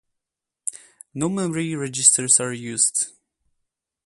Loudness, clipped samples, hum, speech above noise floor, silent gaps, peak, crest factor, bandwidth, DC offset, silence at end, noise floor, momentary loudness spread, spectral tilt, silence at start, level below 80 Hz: -19 LUFS; under 0.1%; none; 63 dB; none; 0 dBFS; 24 dB; 12 kHz; under 0.1%; 0.95 s; -85 dBFS; 16 LU; -2.5 dB/octave; 0.65 s; -68 dBFS